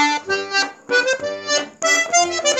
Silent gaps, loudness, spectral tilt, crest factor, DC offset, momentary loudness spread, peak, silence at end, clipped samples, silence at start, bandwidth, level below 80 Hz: none; -18 LUFS; 0 dB/octave; 16 dB; under 0.1%; 6 LU; -4 dBFS; 0 s; under 0.1%; 0 s; 17 kHz; -68 dBFS